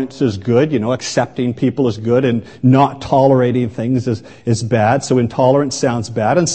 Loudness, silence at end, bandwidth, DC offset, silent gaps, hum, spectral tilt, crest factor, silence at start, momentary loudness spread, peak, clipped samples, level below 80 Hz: -15 LUFS; 0 s; 8.8 kHz; 0.3%; none; none; -6 dB/octave; 14 dB; 0 s; 6 LU; 0 dBFS; under 0.1%; -50 dBFS